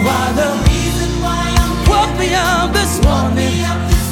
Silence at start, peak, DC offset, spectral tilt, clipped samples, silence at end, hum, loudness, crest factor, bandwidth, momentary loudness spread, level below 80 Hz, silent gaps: 0 s; 0 dBFS; under 0.1%; -4.5 dB/octave; under 0.1%; 0 s; none; -14 LUFS; 14 dB; 18 kHz; 4 LU; -18 dBFS; none